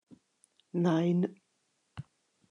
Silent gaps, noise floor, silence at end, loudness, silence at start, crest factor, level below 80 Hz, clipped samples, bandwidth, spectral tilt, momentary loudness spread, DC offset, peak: none; -77 dBFS; 0.5 s; -30 LUFS; 0.75 s; 18 dB; -76 dBFS; under 0.1%; 7 kHz; -8.5 dB/octave; 21 LU; under 0.1%; -16 dBFS